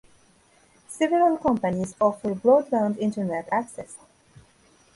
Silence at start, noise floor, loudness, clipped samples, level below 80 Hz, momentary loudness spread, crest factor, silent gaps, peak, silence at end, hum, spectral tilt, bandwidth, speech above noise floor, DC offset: 0.9 s; -59 dBFS; -23 LUFS; under 0.1%; -60 dBFS; 15 LU; 18 dB; none; -6 dBFS; 1 s; none; -6.5 dB/octave; 11.5 kHz; 36 dB; under 0.1%